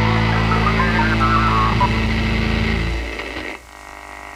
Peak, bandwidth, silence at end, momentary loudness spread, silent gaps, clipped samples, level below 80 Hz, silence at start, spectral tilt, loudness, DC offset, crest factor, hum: -4 dBFS; 12 kHz; 0 s; 18 LU; none; under 0.1%; -26 dBFS; 0 s; -6 dB/octave; -18 LUFS; under 0.1%; 14 dB; none